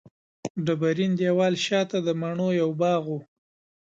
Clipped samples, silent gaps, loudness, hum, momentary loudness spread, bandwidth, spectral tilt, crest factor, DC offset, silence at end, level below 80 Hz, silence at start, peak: under 0.1%; 0.50-0.55 s; -25 LUFS; none; 11 LU; 7.8 kHz; -6 dB/octave; 14 dB; under 0.1%; 0.6 s; -70 dBFS; 0.45 s; -10 dBFS